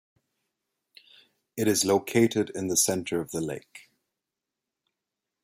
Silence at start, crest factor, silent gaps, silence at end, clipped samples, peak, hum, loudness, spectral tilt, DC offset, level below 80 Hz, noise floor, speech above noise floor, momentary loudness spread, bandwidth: 1.55 s; 20 dB; none; 1.65 s; under 0.1%; -10 dBFS; none; -26 LUFS; -3.5 dB/octave; under 0.1%; -68 dBFS; -87 dBFS; 61 dB; 11 LU; 16.5 kHz